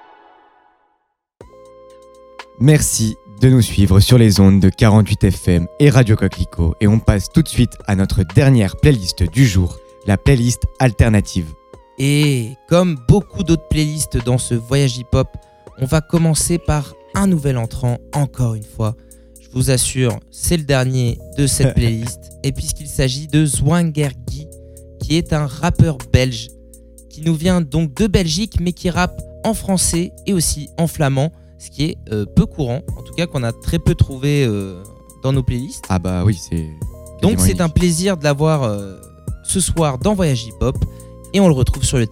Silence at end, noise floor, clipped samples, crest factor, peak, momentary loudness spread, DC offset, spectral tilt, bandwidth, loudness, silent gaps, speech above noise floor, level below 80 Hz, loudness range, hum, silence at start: 0 s; -67 dBFS; under 0.1%; 16 dB; 0 dBFS; 11 LU; under 0.1%; -5.5 dB/octave; 16 kHz; -16 LUFS; none; 52 dB; -30 dBFS; 7 LU; none; 2.4 s